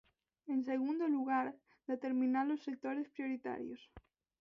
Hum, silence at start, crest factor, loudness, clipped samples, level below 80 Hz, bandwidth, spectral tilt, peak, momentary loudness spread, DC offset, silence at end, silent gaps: none; 0.45 s; 16 dB; -38 LUFS; under 0.1%; -76 dBFS; 6.2 kHz; -4 dB/octave; -24 dBFS; 12 LU; under 0.1%; 0.4 s; none